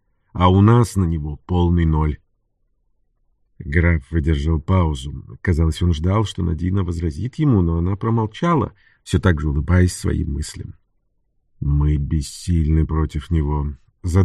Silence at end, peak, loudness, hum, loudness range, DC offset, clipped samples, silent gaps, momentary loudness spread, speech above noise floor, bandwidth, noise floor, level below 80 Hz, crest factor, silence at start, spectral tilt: 0 s; -2 dBFS; -20 LUFS; none; 3 LU; under 0.1%; under 0.1%; none; 11 LU; 48 dB; 12 kHz; -66 dBFS; -28 dBFS; 18 dB; 0.35 s; -7 dB/octave